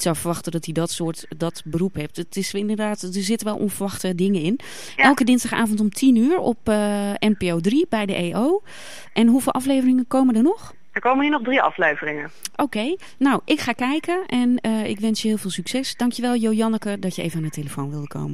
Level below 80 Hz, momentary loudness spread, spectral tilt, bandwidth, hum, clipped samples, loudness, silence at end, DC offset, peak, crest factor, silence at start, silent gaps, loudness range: -56 dBFS; 11 LU; -5 dB/octave; 15.5 kHz; none; under 0.1%; -21 LUFS; 0 s; 1%; -2 dBFS; 18 dB; 0 s; none; 5 LU